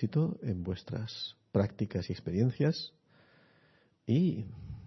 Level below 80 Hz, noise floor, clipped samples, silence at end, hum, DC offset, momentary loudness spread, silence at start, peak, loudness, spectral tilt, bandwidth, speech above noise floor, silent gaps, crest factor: -60 dBFS; -67 dBFS; under 0.1%; 0 s; none; under 0.1%; 11 LU; 0 s; -14 dBFS; -33 LUFS; -8 dB/octave; 6.2 kHz; 35 dB; none; 20 dB